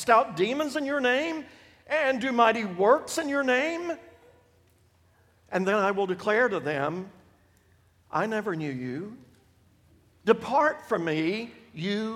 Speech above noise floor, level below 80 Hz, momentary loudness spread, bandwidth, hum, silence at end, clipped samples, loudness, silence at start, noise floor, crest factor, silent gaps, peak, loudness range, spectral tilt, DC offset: 37 dB; -68 dBFS; 13 LU; 16 kHz; none; 0 s; under 0.1%; -27 LUFS; 0 s; -63 dBFS; 22 dB; none; -6 dBFS; 7 LU; -5 dB/octave; under 0.1%